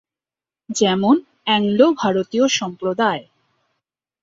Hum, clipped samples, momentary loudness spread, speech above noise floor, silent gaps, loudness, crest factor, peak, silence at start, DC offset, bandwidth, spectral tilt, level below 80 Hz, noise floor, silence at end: none; under 0.1%; 6 LU; over 73 dB; none; -18 LUFS; 18 dB; -2 dBFS; 0.7 s; under 0.1%; 7.8 kHz; -4 dB/octave; -62 dBFS; under -90 dBFS; 1 s